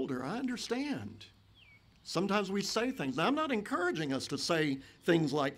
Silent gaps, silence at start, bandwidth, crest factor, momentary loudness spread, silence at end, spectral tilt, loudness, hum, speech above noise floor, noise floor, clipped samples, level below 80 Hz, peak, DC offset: none; 0 s; 16 kHz; 18 dB; 8 LU; 0 s; -4.5 dB/octave; -33 LUFS; none; 28 dB; -61 dBFS; under 0.1%; -68 dBFS; -16 dBFS; under 0.1%